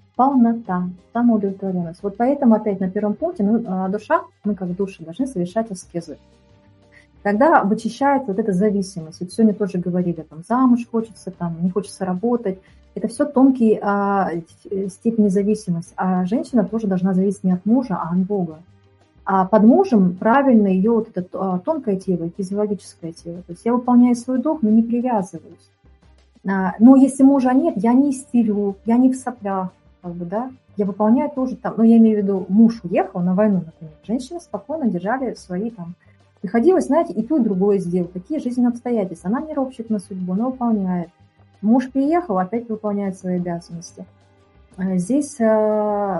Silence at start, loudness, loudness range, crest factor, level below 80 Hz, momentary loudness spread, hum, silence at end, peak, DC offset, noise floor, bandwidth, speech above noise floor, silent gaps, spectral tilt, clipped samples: 0.2 s; -19 LUFS; 6 LU; 18 dB; -56 dBFS; 14 LU; none; 0 s; 0 dBFS; under 0.1%; -53 dBFS; 11.5 kHz; 34 dB; none; -8 dB/octave; under 0.1%